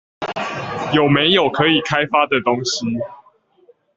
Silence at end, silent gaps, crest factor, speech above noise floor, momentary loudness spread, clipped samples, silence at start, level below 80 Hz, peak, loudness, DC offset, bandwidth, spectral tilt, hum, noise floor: 0.8 s; none; 18 dB; 37 dB; 11 LU; under 0.1%; 0.2 s; -54 dBFS; -2 dBFS; -17 LUFS; under 0.1%; 7.8 kHz; -4.5 dB/octave; none; -54 dBFS